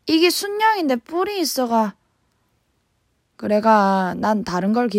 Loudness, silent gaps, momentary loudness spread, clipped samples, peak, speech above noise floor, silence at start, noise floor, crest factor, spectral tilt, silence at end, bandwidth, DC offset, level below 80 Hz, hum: -19 LUFS; none; 6 LU; under 0.1%; -2 dBFS; 49 dB; 0.05 s; -67 dBFS; 18 dB; -4.5 dB/octave; 0 s; 16 kHz; under 0.1%; -60 dBFS; none